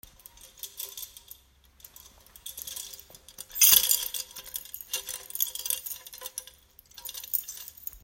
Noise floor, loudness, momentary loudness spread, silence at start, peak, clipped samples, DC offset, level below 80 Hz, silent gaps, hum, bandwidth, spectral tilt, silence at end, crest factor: -59 dBFS; -26 LUFS; 24 LU; 0.45 s; -2 dBFS; under 0.1%; under 0.1%; -62 dBFS; none; none; 16.5 kHz; 2.5 dB/octave; 0.05 s; 30 dB